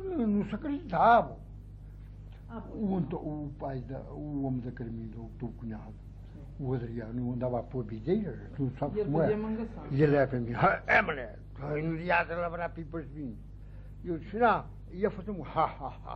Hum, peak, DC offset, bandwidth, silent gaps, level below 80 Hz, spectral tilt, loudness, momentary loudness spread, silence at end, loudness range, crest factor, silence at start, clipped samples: 50 Hz at -45 dBFS; -12 dBFS; under 0.1%; 6.6 kHz; none; -48 dBFS; -9 dB/octave; -31 LUFS; 22 LU; 0 s; 9 LU; 20 dB; 0 s; under 0.1%